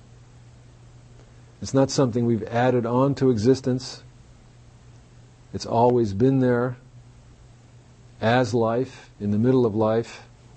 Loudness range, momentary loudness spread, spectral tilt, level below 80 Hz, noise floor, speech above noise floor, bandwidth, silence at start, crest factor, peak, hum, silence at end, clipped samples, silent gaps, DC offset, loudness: 2 LU; 16 LU; -7 dB/octave; -54 dBFS; -50 dBFS; 28 dB; 8.6 kHz; 1.6 s; 18 dB; -6 dBFS; none; 0.35 s; under 0.1%; none; under 0.1%; -22 LUFS